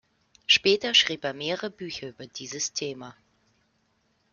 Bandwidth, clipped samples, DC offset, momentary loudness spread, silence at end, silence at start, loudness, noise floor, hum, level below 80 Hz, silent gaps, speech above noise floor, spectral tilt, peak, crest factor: 7.4 kHz; under 0.1%; under 0.1%; 19 LU; 1.2 s; 0.5 s; -24 LUFS; -70 dBFS; none; -68 dBFS; none; 42 dB; -1.5 dB/octave; -6 dBFS; 24 dB